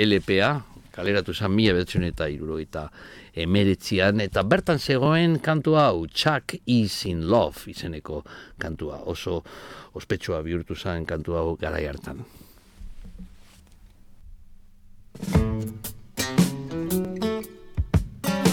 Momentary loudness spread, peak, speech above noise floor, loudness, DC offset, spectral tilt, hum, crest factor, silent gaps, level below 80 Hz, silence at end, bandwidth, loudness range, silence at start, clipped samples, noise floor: 16 LU; -6 dBFS; 26 dB; -25 LUFS; under 0.1%; -5.5 dB/octave; none; 20 dB; none; -40 dBFS; 0 s; 18.5 kHz; 11 LU; 0 s; under 0.1%; -50 dBFS